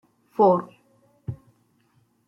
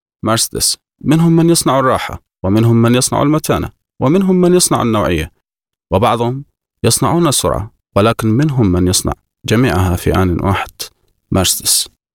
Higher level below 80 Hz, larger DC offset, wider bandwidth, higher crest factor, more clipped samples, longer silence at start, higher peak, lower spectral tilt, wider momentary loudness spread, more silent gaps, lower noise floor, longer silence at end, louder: second, -64 dBFS vs -34 dBFS; neither; second, 5.8 kHz vs 18.5 kHz; first, 20 dB vs 14 dB; neither; first, 0.4 s vs 0.25 s; second, -6 dBFS vs 0 dBFS; first, -10 dB/octave vs -4.5 dB/octave; first, 24 LU vs 9 LU; neither; second, -65 dBFS vs -78 dBFS; first, 0.9 s vs 0.25 s; second, -22 LUFS vs -13 LUFS